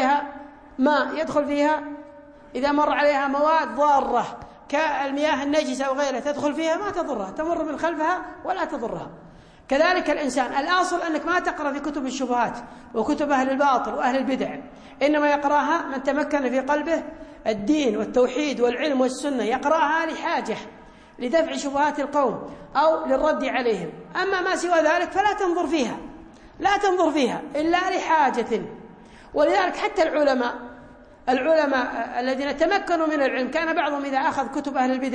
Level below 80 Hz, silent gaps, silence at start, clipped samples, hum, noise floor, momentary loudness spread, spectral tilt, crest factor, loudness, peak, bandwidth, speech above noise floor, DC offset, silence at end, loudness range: -54 dBFS; none; 0 s; under 0.1%; none; -46 dBFS; 9 LU; -4 dB/octave; 16 dB; -23 LUFS; -8 dBFS; 10.5 kHz; 24 dB; under 0.1%; 0 s; 2 LU